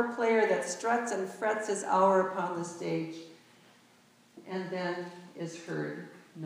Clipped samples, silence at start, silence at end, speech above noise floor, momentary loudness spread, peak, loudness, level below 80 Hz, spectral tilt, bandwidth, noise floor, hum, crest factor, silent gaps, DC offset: under 0.1%; 0 s; 0 s; 31 dB; 16 LU; -14 dBFS; -31 LUFS; under -90 dBFS; -4.5 dB/octave; 15.5 kHz; -62 dBFS; none; 18 dB; none; under 0.1%